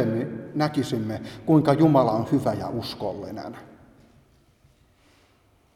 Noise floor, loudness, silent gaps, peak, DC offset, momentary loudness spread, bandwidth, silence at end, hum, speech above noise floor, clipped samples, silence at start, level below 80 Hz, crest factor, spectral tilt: -61 dBFS; -24 LUFS; none; -6 dBFS; under 0.1%; 17 LU; 14 kHz; 2.1 s; none; 38 dB; under 0.1%; 0 s; -58 dBFS; 20 dB; -7.5 dB/octave